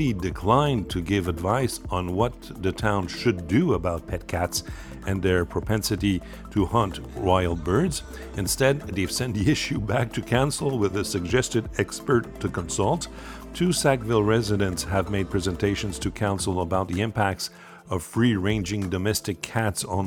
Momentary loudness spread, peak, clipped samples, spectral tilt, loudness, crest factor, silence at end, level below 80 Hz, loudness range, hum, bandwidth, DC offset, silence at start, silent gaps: 8 LU; -4 dBFS; under 0.1%; -5 dB/octave; -25 LUFS; 20 dB; 0 s; -42 dBFS; 2 LU; none; 18.5 kHz; under 0.1%; 0 s; none